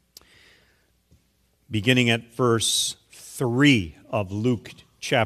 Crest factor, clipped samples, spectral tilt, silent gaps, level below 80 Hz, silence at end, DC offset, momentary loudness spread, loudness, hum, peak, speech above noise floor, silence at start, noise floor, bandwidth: 22 dB; under 0.1%; -4 dB/octave; none; -56 dBFS; 0 s; under 0.1%; 12 LU; -22 LUFS; none; -2 dBFS; 44 dB; 1.7 s; -66 dBFS; 15 kHz